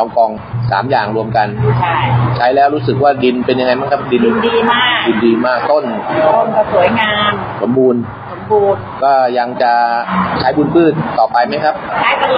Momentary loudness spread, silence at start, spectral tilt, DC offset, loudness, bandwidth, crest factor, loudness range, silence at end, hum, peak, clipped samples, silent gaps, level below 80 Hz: 4 LU; 0 s; -4 dB/octave; under 0.1%; -13 LUFS; 5.4 kHz; 12 dB; 1 LU; 0 s; none; 0 dBFS; under 0.1%; none; -46 dBFS